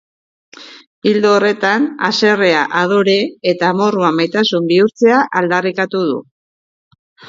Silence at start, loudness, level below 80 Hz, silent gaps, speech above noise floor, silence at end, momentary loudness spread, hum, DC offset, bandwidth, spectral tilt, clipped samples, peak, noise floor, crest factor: 0.6 s; -14 LUFS; -64 dBFS; 0.87-1.02 s; over 77 dB; 1.05 s; 6 LU; none; under 0.1%; 7.6 kHz; -5 dB/octave; under 0.1%; 0 dBFS; under -90 dBFS; 14 dB